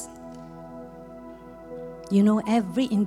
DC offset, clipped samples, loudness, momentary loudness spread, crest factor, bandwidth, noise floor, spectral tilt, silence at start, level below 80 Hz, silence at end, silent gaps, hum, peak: under 0.1%; under 0.1%; -23 LUFS; 22 LU; 16 dB; 12 kHz; -43 dBFS; -7 dB/octave; 0 s; -58 dBFS; 0 s; none; 50 Hz at -55 dBFS; -10 dBFS